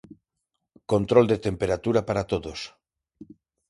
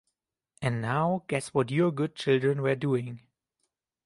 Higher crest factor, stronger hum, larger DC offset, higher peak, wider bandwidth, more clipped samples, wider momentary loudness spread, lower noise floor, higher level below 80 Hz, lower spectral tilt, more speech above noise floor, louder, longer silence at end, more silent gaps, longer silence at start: about the same, 22 dB vs 18 dB; neither; neither; first, -4 dBFS vs -12 dBFS; about the same, 11.5 kHz vs 11.5 kHz; neither; first, 17 LU vs 7 LU; about the same, -81 dBFS vs -82 dBFS; first, -50 dBFS vs -66 dBFS; about the same, -6.5 dB/octave vs -6.5 dB/octave; about the same, 58 dB vs 55 dB; first, -24 LUFS vs -28 LUFS; second, 0.45 s vs 0.85 s; neither; first, 0.9 s vs 0.6 s